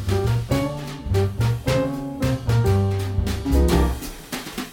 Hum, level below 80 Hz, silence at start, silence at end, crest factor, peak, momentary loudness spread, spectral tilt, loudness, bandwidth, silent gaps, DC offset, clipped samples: none; -28 dBFS; 0 s; 0 s; 18 dB; -4 dBFS; 11 LU; -6.5 dB/octave; -23 LUFS; 17 kHz; none; under 0.1%; under 0.1%